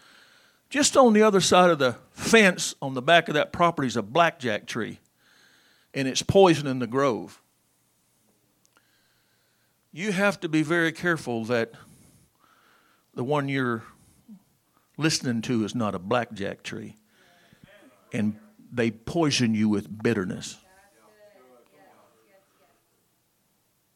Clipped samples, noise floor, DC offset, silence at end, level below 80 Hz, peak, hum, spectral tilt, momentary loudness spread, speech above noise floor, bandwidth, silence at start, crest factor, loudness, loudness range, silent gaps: under 0.1%; -69 dBFS; under 0.1%; 3.4 s; -62 dBFS; -2 dBFS; none; -4.5 dB/octave; 16 LU; 46 dB; 16 kHz; 0.7 s; 24 dB; -24 LUFS; 12 LU; none